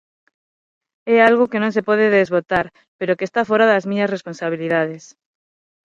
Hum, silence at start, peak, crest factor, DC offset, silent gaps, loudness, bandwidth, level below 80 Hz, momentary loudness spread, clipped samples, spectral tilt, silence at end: none; 1.05 s; 0 dBFS; 18 dB; under 0.1%; 2.88-2.99 s; -18 LUFS; 7.6 kHz; -58 dBFS; 12 LU; under 0.1%; -6 dB/octave; 0.95 s